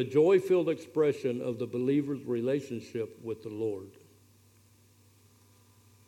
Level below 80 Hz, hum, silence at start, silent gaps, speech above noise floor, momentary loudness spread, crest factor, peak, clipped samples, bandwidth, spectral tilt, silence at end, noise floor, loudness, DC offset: -78 dBFS; none; 0 s; none; 32 dB; 14 LU; 18 dB; -14 dBFS; under 0.1%; 15 kHz; -7.5 dB/octave; 2.15 s; -62 dBFS; -30 LUFS; under 0.1%